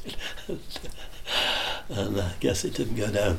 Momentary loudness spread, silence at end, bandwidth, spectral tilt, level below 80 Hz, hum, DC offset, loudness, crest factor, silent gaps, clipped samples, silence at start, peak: 14 LU; 0 s; 16.5 kHz; -4 dB/octave; -42 dBFS; none; under 0.1%; -28 LUFS; 18 dB; none; under 0.1%; 0 s; -10 dBFS